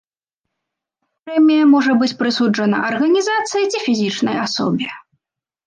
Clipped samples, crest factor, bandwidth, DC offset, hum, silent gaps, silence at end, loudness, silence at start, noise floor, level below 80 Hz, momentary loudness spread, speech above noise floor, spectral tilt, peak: under 0.1%; 14 dB; 9.6 kHz; under 0.1%; none; none; 0.65 s; -16 LUFS; 1.25 s; -81 dBFS; -68 dBFS; 7 LU; 66 dB; -4.5 dB/octave; -4 dBFS